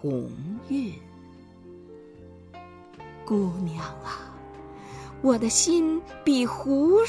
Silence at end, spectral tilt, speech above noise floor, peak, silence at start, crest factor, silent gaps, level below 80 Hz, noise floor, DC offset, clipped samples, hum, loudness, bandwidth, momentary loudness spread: 0 s; -4.5 dB/octave; 24 dB; -8 dBFS; 0 s; 18 dB; none; -54 dBFS; -48 dBFS; under 0.1%; under 0.1%; none; -25 LUFS; 11 kHz; 26 LU